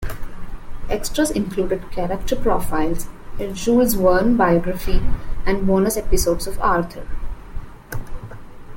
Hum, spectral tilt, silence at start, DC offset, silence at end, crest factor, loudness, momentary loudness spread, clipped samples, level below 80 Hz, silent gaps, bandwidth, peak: none; -5.5 dB/octave; 0 s; under 0.1%; 0 s; 16 dB; -20 LUFS; 21 LU; under 0.1%; -28 dBFS; none; 17 kHz; -2 dBFS